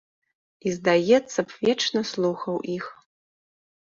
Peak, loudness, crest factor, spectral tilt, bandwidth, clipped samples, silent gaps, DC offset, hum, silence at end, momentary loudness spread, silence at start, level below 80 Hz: -6 dBFS; -24 LUFS; 18 dB; -4.5 dB/octave; 7.6 kHz; under 0.1%; none; under 0.1%; none; 1 s; 12 LU; 0.65 s; -68 dBFS